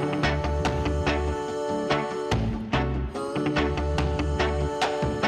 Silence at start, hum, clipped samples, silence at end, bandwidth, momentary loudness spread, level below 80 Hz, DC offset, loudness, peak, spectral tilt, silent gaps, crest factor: 0 s; none; under 0.1%; 0 s; 12 kHz; 4 LU; -32 dBFS; under 0.1%; -27 LUFS; -12 dBFS; -6 dB/octave; none; 12 dB